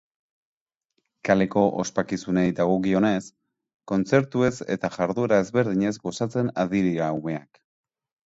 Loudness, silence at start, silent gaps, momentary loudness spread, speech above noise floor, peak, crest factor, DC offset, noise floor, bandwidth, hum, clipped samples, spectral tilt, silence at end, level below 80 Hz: -24 LUFS; 1.25 s; 3.74-3.79 s; 7 LU; 54 dB; -4 dBFS; 20 dB; under 0.1%; -77 dBFS; 8 kHz; none; under 0.1%; -6.5 dB/octave; 0.9 s; -58 dBFS